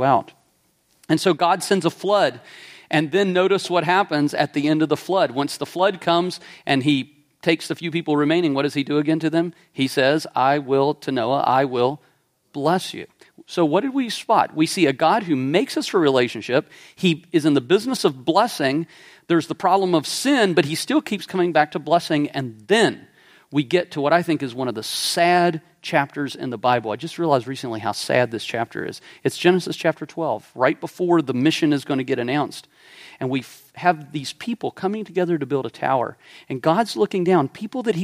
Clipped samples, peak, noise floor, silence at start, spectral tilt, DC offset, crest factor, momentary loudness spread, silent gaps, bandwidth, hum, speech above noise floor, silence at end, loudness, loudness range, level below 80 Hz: under 0.1%; -2 dBFS; -63 dBFS; 0 s; -5 dB/octave; under 0.1%; 20 dB; 9 LU; none; 15.5 kHz; none; 43 dB; 0 s; -21 LUFS; 3 LU; -70 dBFS